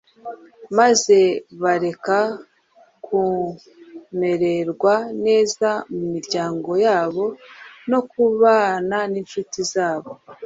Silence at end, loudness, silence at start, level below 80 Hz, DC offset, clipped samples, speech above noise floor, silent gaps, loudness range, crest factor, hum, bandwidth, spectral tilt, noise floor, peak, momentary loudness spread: 0 s; -19 LUFS; 0.25 s; -64 dBFS; under 0.1%; under 0.1%; 35 dB; none; 3 LU; 18 dB; none; 8 kHz; -4 dB/octave; -55 dBFS; -2 dBFS; 14 LU